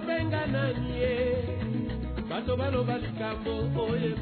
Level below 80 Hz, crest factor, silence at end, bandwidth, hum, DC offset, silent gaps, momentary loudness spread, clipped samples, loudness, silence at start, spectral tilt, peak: -42 dBFS; 14 dB; 0 s; 4.6 kHz; none; under 0.1%; none; 5 LU; under 0.1%; -30 LUFS; 0 s; -10.5 dB/octave; -16 dBFS